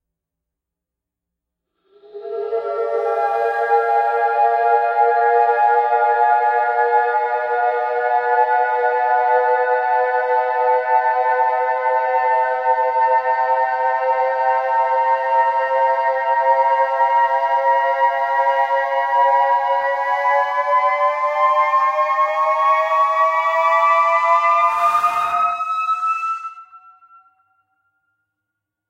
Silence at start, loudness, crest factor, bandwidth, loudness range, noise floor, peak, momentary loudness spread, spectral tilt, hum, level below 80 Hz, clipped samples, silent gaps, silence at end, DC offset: 2.15 s; -17 LUFS; 14 dB; 11 kHz; 5 LU; -84 dBFS; -4 dBFS; 4 LU; -1.5 dB/octave; none; -68 dBFS; under 0.1%; none; 2.1 s; under 0.1%